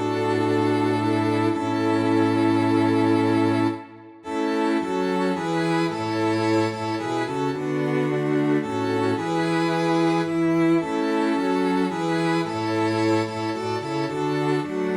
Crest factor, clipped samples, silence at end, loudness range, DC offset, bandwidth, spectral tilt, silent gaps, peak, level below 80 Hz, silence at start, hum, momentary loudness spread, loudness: 12 dB; under 0.1%; 0 s; 3 LU; under 0.1%; 12 kHz; -6.5 dB/octave; none; -10 dBFS; -62 dBFS; 0 s; none; 6 LU; -23 LUFS